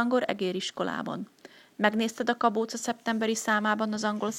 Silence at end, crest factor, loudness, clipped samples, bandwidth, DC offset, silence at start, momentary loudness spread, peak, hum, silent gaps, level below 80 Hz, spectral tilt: 0 s; 22 dB; -28 LUFS; under 0.1%; 16 kHz; under 0.1%; 0 s; 9 LU; -6 dBFS; none; none; -74 dBFS; -4 dB/octave